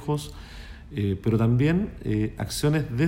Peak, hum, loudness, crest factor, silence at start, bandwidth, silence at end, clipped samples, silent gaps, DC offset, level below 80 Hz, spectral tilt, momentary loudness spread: -10 dBFS; none; -25 LUFS; 14 dB; 0 s; 16.5 kHz; 0 s; under 0.1%; none; under 0.1%; -42 dBFS; -6.5 dB/octave; 19 LU